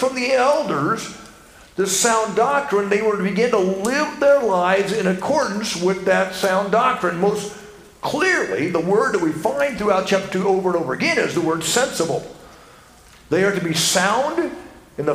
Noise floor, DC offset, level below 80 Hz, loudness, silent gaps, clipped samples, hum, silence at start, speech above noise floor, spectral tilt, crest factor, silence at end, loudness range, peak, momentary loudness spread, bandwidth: -47 dBFS; under 0.1%; -54 dBFS; -19 LUFS; none; under 0.1%; none; 0 s; 28 dB; -3.5 dB/octave; 16 dB; 0 s; 3 LU; -2 dBFS; 9 LU; 16 kHz